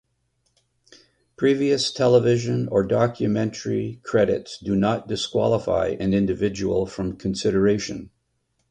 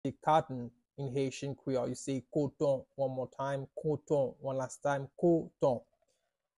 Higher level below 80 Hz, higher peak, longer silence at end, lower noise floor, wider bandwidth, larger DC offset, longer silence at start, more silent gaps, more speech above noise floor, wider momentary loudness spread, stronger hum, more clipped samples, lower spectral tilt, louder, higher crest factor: first, -48 dBFS vs -68 dBFS; first, -6 dBFS vs -16 dBFS; about the same, 0.65 s vs 0.75 s; second, -71 dBFS vs -81 dBFS; second, 10.5 kHz vs 12 kHz; neither; first, 1.4 s vs 0.05 s; neither; about the same, 50 dB vs 48 dB; about the same, 8 LU vs 9 LU; neither; neither; about the same, -6 dB/octave vs -6.5 dB/octave; first, -22 LUFS vs -34 LUFS; about the same, 18 dB vs 20 dB